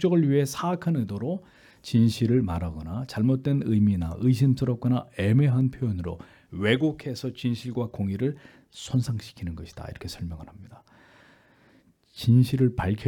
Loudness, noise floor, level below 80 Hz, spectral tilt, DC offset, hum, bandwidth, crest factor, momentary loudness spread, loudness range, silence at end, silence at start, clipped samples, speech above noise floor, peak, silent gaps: -26 LUFS; -60 dBFS; -52 dBFS; -7.5 dB/octave; under 0.1%; none; 17.5 kHz; 18 dB; 16 LU; 11 LU; 0 s; 0 s; under 0.1%; 35 dB; -6 dBFS; none